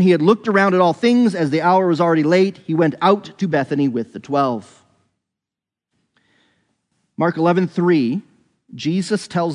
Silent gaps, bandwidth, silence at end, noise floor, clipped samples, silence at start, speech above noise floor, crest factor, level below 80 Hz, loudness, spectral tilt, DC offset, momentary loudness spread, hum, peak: none; 10.5 kHz; 0 s; -87 dBFS; under 0.1%; 0 s; 70 dB; 18 dB; -70 dBFS; -17 LUFS; -7 dB/octave; under 0.1%; 7 LU; none; 0 dBFS